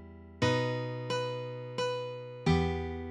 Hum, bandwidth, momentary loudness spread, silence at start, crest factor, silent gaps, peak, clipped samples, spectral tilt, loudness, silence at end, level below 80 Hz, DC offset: none; 10.5 kHz; 10 LU; 0 s; 18 dB; none; -14 dBFS; under 0.1%; -6 dB/octave; -33 LUFS; 0 s; -48 dBFS; under 0.1%